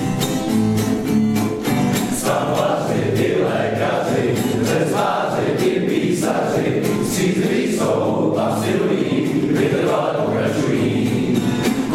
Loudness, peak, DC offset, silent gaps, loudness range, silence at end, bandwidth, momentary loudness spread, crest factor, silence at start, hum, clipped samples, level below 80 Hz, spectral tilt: -19 LUFS; -4 dBFS; under 0.1%; none; 0 LU; 0 s; 16.5 kHz; 2 LU; 14 dB; 0 s; none; under 0.1%; -48 dBFS; -5.5 dB/octave